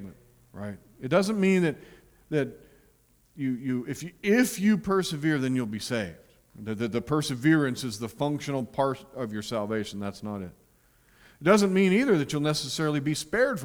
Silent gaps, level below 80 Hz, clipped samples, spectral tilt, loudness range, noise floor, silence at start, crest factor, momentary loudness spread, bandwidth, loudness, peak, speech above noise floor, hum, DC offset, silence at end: none; -60 dBFS; under 0.1%; -5.5 dB/octave; 4 LU; -63 dBFS; 0 s; 20 dB; 14 LU; over 20 kHz; -27 LUFS; -8 dBFS; 36 dB; none; under 0.1%; 0 s